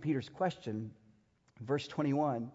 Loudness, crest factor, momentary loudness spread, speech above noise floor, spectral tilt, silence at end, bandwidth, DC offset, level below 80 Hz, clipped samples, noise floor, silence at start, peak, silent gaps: -36 LUFS; 16 dB; 12 LU; 34 dB; -6 dB/octave; 0 s; 7.6 kHz; under 0.1%; -74 dBFS; under 0.1%; -69 dBFS; 0 s; -20 dBFS; none